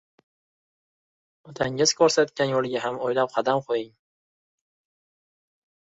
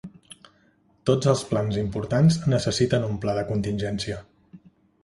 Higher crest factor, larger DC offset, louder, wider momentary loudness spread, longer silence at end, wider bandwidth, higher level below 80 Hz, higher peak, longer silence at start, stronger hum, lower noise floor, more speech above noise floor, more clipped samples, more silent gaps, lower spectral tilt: about the same, 22 dB vs 20 dB; neither; about the same, -24 LUFS vs -24 LUFS; about the same, 10 LU vs 10 LU; first, 2.1 s vs 0.45 s; second, 8 kHz vs 11.5 kHz; second, -66 dBFS vs -48 dBFS; about the same, -6 dBFS vs -6 dBFS; first, 1.45 s vs 0.05 s; neither; first, under -90 dBFS vs -62 dBFS; first, over 67 dB vs 39 dB; neither; neither; second, -3.5 dB/octave vs -6 dB/octave